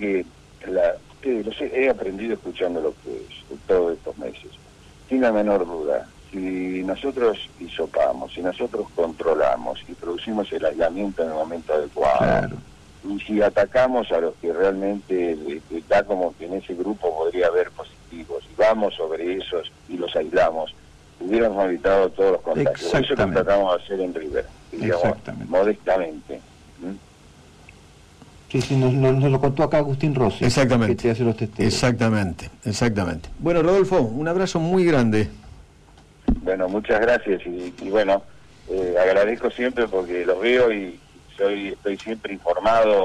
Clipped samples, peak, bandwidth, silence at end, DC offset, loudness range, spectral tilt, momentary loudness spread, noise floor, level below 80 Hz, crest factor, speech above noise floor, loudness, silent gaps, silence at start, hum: under 0.1%; -10 dBFS; 12 kHz; 0 s; under 0.1%; 4 LU; -6.5 dB/octave; 13 LU; -50 dBFS; -44 dBFS; 12 dB; 29 dB; -22 LUFS; none; 0 s; none